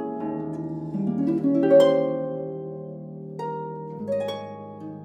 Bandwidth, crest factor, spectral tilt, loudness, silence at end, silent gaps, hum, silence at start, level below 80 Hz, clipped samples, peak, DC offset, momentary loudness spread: 9 kHz; 18 dB; -8 dB/octave; -25 LUFS; 0 s; none; none; 0 s; -64 dBFS; under 0.1%; -6 dBFS; under 0.1%; 20 LU